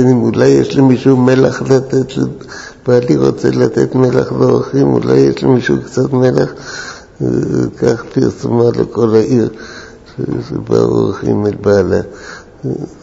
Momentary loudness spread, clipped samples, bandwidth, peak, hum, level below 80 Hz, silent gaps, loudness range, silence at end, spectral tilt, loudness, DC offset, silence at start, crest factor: 15 LU; 0.1%; 8 kHz; 0 dBFS; none; -42 dBFS; none; 3 LU; 0.1 s; -7.5 dB/octave; -12 LUFS; under 0.1%; 0 s; 12 dB